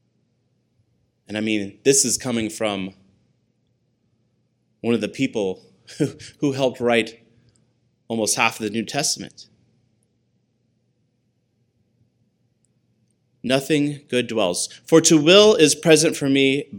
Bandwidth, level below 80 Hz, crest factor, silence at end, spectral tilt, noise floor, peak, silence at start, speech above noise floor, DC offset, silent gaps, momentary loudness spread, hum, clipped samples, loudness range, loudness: 17 kHz; -66 dBFS; 22 dB; 0 s; -3.5 dB/octave; -68 dBFS; 0 dBFS; 1.3 s; 49 dB; under 0.1%; none; 14 LU; none; under 0.1%; 12 LU; -19 LUFS